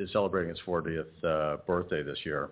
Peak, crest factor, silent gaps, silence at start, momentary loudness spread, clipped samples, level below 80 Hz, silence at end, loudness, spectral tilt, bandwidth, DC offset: -14 dBFS; 16 dB; none; 0 s; 5 LU; under 0.1%; -54 dBFS; 0 s; -32 LUFS; -4.5 dB/octave; 4 kHz; under 0.1%